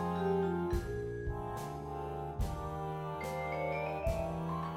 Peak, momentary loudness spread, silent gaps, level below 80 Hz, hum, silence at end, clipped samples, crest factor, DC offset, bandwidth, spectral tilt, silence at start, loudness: -22 dBFS; 7 LU; none; -46 dBFS; none; 0 s; under 0.1%; 16 dB; under 0.1%; 16 kHz; -7 dB/octave; 0 s; -38 LUFS